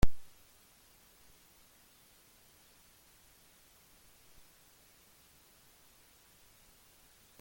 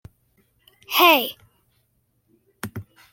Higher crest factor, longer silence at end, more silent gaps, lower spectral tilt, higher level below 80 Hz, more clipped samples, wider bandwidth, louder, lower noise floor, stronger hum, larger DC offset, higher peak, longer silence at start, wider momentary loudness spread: about the same, 26 dB vs 24 dB; first, 7.2 s vs 0.3 s; neither; first, -5.5 dB/octave vs -2.5 dB/octave; first, -48 dBFS vs -64 dBFS; neither; about the same, 17 kHz vs 17 kHz; second, -55 LUFS vs -17 LUFS; second, -64 dBFS vs -68 dBFS; neither; neither; second, -12 dBFS vs -2 dBFS; second, 0.05 s vs 0.9 s; second, 0 LU vs 23 LU